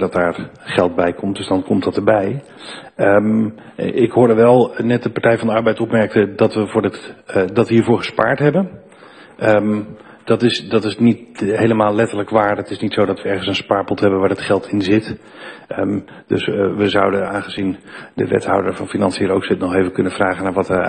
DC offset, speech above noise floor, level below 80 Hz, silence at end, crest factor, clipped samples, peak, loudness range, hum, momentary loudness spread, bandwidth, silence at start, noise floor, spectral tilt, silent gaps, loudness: under 0.1%; 25 dB; -52 dBFS; 0 s; 16 dB; under 0.1%; 0 dBFS; 4 LU; none; 9 LU; 10 kHz; 0 s; -42 dBFS; -6.5 dB/octave; none; -17 LUFS